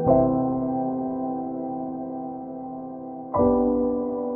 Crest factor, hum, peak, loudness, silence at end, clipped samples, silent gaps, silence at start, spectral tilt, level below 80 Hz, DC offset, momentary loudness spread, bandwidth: 18 dB; none; -6 dBFS; -26 LUFS; 0 s; under 0.1%; none; 0 s; -15.5 dB/octave; -48 dBFS; under 0.1%; 14 LU; 2.1 kHz